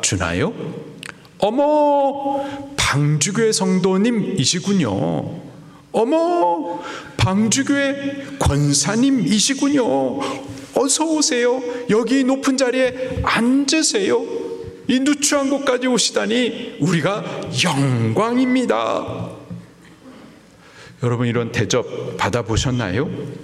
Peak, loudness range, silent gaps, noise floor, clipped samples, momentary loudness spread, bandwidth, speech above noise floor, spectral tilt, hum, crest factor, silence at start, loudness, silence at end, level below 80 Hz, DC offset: -2 dBFS; 5 LU; none; -45 dBFS; under 0.1%; 11 LU; 14.5 kHz; 27 dB; -4.5 dB/octave; none; 16 dB; 0 s; -18 LUFS; 0 s; -44 dBFS; under 0.1%